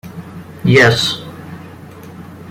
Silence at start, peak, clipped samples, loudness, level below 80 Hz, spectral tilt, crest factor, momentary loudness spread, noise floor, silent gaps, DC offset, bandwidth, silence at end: 0.05 s; 0 dBFS; under 0.1%; -12 LUFS; -46 dBFS; -5 dB/octave; 18 dB; 25 LU; -34 dBFS; none; under 0.1%; 16 kHz; 0 s